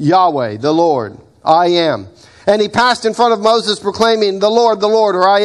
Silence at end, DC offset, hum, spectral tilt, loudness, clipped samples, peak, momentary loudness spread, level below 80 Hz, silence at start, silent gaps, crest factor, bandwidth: 0 s; under 0.1%; none; -4.5 dB/octave; -13 LUFS; under 0.1%; 0 dBFS; 7 LU; -54 dBFS; 0 s; none; 12 dB; 12 kHz